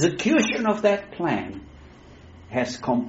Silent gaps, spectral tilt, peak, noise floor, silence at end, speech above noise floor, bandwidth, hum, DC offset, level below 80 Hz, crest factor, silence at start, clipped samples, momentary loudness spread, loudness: none; -4.5 dB/octave; -6 dBFS; -46 dBFS; 0 s; 24 dB; 8 kHz; none; under 0.1%; -54 dBFS; 18 dB; 0 s; under 0.1%; 10 LU; -23 LUFS